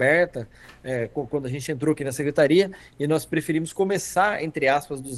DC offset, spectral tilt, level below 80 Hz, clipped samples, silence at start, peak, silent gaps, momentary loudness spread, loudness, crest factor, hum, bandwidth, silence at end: under 0.1%; -5 dB/octave; -56 dBFS; under 0.1%; 0 s; -6 dBFS; none; 10 LU; -24 LUFS; 16 dB; none; 12.5 kHz; 0 s